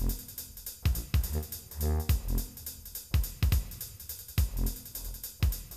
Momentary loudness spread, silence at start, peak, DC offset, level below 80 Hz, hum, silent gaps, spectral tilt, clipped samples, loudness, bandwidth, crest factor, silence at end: 10 LU; 0 s; -14 dBFS; under 0.1%; -34 dBFS; none; none; -5 dB/octave; under 0.1%; -34 LUFS; 19 kHz; 18 dB; 0 s